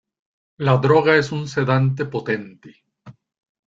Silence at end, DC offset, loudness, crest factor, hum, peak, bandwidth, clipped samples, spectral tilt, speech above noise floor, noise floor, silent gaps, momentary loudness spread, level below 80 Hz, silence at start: 0.65 s; under 0.1%; -19 LUFS; 18 dB; none; -2 dBFS; 7.6 kHz; under 0.1%; -7 dB/octave; 28 dB; -46 dBFS; none; 10 LU; -58 dBFS; 0.6 s